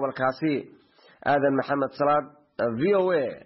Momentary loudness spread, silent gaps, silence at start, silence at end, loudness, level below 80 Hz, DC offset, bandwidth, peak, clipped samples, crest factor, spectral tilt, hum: 8 LU; none; 0 s; 0.05 s; -25 LUFS; -66 dBFS; under 0.1%; 5.8 kHz; -12 dBFS; under 0.1%; 14 dB; -5 dB/octave; none